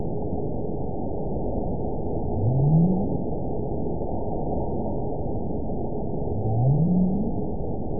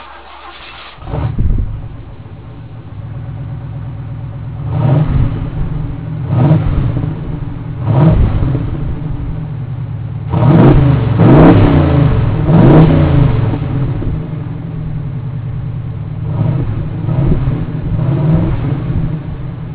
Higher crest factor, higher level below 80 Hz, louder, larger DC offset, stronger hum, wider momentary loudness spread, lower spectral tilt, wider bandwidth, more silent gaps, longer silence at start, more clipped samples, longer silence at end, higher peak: about the same, 14 dB vs 12 dB; second, -36 dBFS vs -22 dBFS; second, -26 LUFS vs -13 LUFS; first, 3% vs 0.9%; neither; second, 9 LU vs 19 LU; first, -19.5 dB/octave vs -12.5 dB/octave; second, 1 kHz vs 4 kHz; neither; about the same, 0 s vs 0 s; second, under 0.1% vs 0.8%; about the same, 0 s vs 0 s; second, -10 dBFS vs 0 dBFS